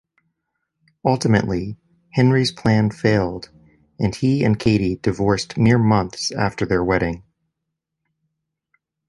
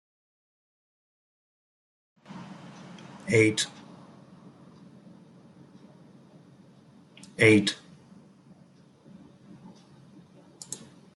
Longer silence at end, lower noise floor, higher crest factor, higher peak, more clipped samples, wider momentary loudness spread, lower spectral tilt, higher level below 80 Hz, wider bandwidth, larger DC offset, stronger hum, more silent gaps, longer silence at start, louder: first, 1.9 s vs 0.4 s; first, -80 dBFS vs -57 dBFS; second, 18 dB vs 26 dB; first, -2 dBFS vs -6 dBFS; neither; second, 9 LU vs 31 LU; first, -6.5 dB/octave vs -4.5 dB/octave; first, -42 dBFS vs -70 dBFS; about the same, 11.5 kHz vs 12 kHz; neither; neither; neither; second, 1.05 s vs 2.35 s; first, -19 LUFS vs -24 LUFS